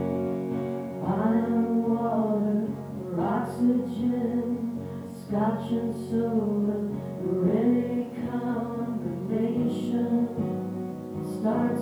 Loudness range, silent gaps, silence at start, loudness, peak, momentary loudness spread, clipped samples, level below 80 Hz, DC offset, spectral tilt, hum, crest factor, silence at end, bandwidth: 2 LU; none; 0 s; -28 LUFS; -12 dBFS; 8 LU; under 0.1%; -64 dBFS; under 0.1%; -9 dB/octave; none; 14 dB; 0 s; 12.5 kHz